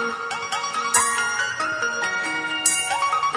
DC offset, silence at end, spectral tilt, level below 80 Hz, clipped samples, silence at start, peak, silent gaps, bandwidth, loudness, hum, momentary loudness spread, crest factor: under 0.1%; 0 s; 0.5 dB/octave; -64 dBFS; under 0.1%; 0 s; -4 dBFS; none; 11 kHz; -21 LUFS; none; 7 LU; 20 dB